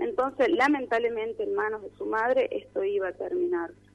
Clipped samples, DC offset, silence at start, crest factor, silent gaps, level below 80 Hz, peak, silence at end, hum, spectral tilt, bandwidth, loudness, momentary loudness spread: under 0.1%; under 0.1%; 0 s; 16 dB; none; -64 dBFS; -12 dBFS; 0.2 s; 50 Hz at -60 dBFS; -5 dB/octave; 11.5 kHz; -27 LUFS; 8 LU